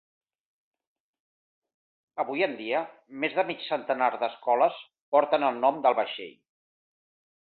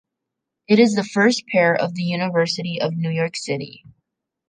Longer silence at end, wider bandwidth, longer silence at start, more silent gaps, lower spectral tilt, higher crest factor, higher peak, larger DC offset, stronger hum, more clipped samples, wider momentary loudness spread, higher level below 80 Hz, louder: first, 1.25 s vs 0.8 s; second, 4.6 kHz vs 9.8 kHz; first, 2.15 s vs 0.7 s; first, 5.01-5.12 s vs none; first, -8 dB/octave vs -5.5 dB/octave; about the same, 22 dB vs 18 dB; second, -8 dBFS vs -2 dBFS; neither; neither; neither; first, 13 LU vs 10 LU; second, -80 dBFS vs -68 dBFS; second, -27 LUFS vs -20 LUFS